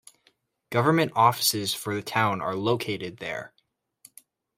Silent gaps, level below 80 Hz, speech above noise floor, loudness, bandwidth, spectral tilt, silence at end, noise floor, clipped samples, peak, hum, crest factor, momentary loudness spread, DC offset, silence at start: none; -68 dBFS; 42 dB; -25 LUFS; 16 kHz; -4 dB/octave; 1.1 s; -67 dBFS; under 0.1%; -6 dBFS; none; 22 dB; 14 LU; under 0.1%; 0.7 s